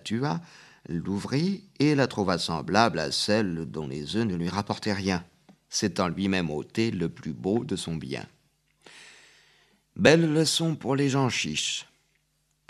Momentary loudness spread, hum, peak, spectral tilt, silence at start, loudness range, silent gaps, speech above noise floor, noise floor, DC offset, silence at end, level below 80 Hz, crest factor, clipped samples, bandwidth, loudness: 11 LU; none; -2 dBFS; -4.5 dB/octave; 0.05 s; 5 LU; none; 45 dB; -72 dBFS; under 0.1%; 0.85 s; -58 dBFS; 26 dB; under 0.1%; 14 kHz; -27 LUFS